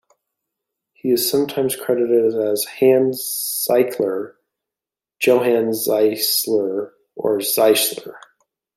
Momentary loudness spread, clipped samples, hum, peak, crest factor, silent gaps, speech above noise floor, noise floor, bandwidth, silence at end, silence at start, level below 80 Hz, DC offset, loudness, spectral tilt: 11 LU; under 0.1%; none; -2 dBFS; 16 dB; none; 70 dB; -88 dBFS; 16 kHz; 0.6 s; 1.05 s; -68 dBFS; under 0.1%; -18 LUFS; -3 dB/octave